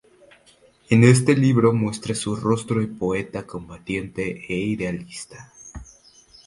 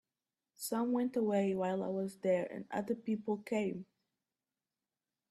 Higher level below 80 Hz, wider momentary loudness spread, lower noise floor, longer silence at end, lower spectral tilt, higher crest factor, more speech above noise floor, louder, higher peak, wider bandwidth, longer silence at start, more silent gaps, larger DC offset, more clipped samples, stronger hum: first, -50 dBFS vs -80 dBFS; first, 23 LU vs 7 LU; second, -56 dBFS vs under -90 dBFS; second, 0.65 s vs 1.45 s; about the same, -6.5 dB/octave vs -6 dB/octave; first, 22 dB vs 16 dB; second, 35 dB vs over 55 dB; first, -21 LUFS vs -36 LUFS; first, 0 dBFS vs -22 dBFS; second, 11.5 kHz vs 13.5 kHz; first, 0.9 s vs 0.6 s; neither; neither; neither; neither